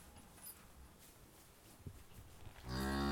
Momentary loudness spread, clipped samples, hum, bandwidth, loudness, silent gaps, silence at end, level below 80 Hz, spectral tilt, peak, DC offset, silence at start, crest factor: 19 LU; under 0.1%; none; 19 kHz; -48 LUFS; none; 0 s; -54 dBFS; -5 dB/octave; -28 dBFS; under 0.1%; 0 s; 20 dB